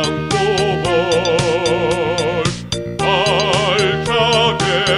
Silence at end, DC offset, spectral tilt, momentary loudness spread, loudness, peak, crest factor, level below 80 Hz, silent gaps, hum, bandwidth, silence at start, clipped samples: 0 s; under 0.1%; -4 dB/octave; 5 LU; -16 LUFS; 0 dBFS; 16 dB; -38 dBFS; none; none; 12 kHz; 0 s; under 0.1%